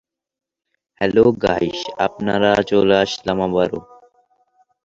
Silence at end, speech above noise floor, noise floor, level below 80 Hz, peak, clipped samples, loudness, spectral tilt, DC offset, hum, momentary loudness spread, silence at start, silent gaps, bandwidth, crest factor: 1.05 s; 59 dB; -76 dBFS; -48 dBFS; -2 dBFS; under 0.1%; -18 LUFS; -5.5 dB/octave; under 0.1%; none; 8 LU; 1 s; none; 7.8 kHz; 18 dB